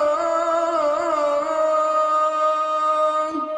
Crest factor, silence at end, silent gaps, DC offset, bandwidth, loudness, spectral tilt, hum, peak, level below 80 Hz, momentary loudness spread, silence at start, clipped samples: 10 dB; 0 s; none; under 0.1%; 10 kHz; -20 LUFS; -3 dB/octave; none; -10 dBFS; -64 dBFS; 2 LU; 0 s; under 0.1%